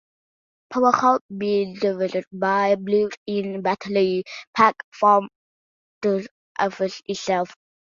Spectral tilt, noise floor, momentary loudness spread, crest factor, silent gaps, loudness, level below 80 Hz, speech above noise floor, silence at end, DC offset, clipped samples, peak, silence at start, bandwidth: -5.5 dB/octave; under -90 dBFS; 10 LU; 22 dB; 1.21-1.29 s, 2.27-2.31 s, 3.17-3.26 s, 4.47-4.53 s, 4.84-4.92 s, 5.36-6.01 s, 6.31-6.55 s; -22 LUFS; -68 dBFS; over 69 dB; 0.4 s; under 0.1%; under 0.1%; -2 dBFS; 0.7 s; 7.4 kHz